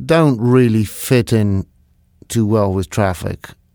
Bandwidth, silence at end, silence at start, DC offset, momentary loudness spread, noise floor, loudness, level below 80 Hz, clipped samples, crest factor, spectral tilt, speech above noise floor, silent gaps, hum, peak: over 20 kHz; 0.25 s; 0 s; under 0.1%; 12 LU; -54 dBFS; -16 LUFS; -42 dBFS; under 0.1%; 16 dB; -6.5 dB/octave; 39 dB; none; none; 0 dBFS